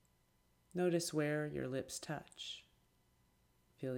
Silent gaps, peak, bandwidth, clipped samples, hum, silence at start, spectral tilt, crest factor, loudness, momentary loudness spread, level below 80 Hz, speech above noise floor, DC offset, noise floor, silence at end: none; -24 dBFS; 16.5 kHz; under 0.1%; none; 0.75 s; -5 dB/octave; 18 dB; -41 LUFS; 12 LU; -74 dBFS; 35 dB; under 0.1%; -75 dBFS; 0 s